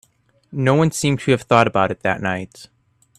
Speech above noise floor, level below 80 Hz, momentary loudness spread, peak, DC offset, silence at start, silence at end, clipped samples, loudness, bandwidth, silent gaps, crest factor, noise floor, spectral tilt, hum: 37 dB; -52 dBFS; 12 LU; 0 dBFS; under 0.1%; 0.5 s; 0.55 s; under 0.1%; -18 LUFS; 14 kHz; none; 20 dB; -55 dBFS; -5.5 dB/octave; none